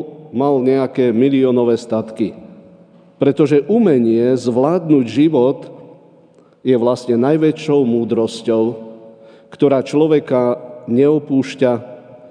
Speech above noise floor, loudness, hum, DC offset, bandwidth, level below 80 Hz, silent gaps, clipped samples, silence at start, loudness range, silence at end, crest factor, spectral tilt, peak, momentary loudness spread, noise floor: 34 dB; -15 LUFS; none; under 0.1%; 10 kHz; -66 dBFS; none; under 0.1%; 0 s; 2 LU; 0.05 s; 16 dB; -7.5 dB/octave; 0 dBFS; 10 LU; -48 dBFS